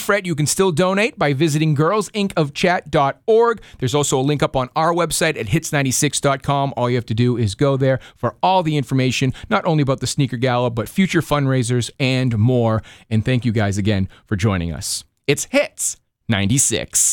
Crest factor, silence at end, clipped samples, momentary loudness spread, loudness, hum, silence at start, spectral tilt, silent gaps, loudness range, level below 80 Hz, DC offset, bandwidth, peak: 16 dB; 0 s; under 0.1%; 5 LU; -18 LUFS; none; 0 s; -4.5 dB/octave; none; 2 LU; -46 dBFS; under 0.1%; 19 kHz; -2 dBFS